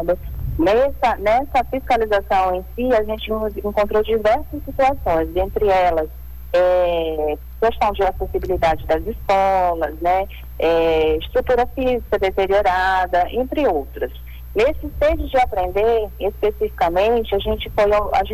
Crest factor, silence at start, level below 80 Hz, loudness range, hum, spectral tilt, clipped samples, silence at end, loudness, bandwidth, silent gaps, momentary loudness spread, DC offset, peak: 10 dB; 0 s; -32 dBFS; 1 LU; none; -6.5 dB/octave; under 0.1%; 0 s; -19 LUFS; 19 kHz; none; 7 LU; under 0.1%; -10 dBFS